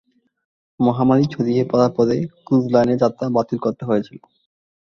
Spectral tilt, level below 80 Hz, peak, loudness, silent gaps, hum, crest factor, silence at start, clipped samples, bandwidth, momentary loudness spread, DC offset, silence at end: -8.5 dB/octave; -56 dBFS; -2 dBFS; -19 LUFS; none; none; 18 dB; 0.8 s; under 0.1%; 7 kHz; 7 LU; under 0.1%; 0.75 s